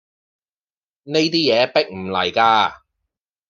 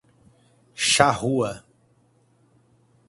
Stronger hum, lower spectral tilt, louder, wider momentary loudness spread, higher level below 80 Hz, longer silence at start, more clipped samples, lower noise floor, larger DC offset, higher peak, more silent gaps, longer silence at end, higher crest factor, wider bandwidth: neither; first, -4.5 dB/octave vs -3 dB/octave; first, -17 LUFS vs -21 LUFS; second, 8 LU vs 23 LU; second, -66 dBFS vs -58 dBFS; first, 1.05 s vs 0.75 s; neither; first, under -90 dBFS vs -62 dBFS; neither; about the same, -2 dBFS vs 0 dBFS; neither; second, 0.75 s vs 1.5 s; second, 18 dB vs 26 dB; second, 7.4 kHz vs 11.5 kHz